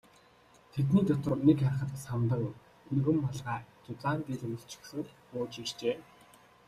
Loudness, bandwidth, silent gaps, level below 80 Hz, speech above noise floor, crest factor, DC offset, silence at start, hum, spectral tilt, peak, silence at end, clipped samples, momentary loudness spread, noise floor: -32 LUFS; 13.5 kHz; none; -62 dBFS; 30 dB; 20 dB; under 0.1%; 0.75 s; none; -7.5 dB/octave; -12 dBFS; 0.65 s; under 0.1%; 15 LU; -61 dBFS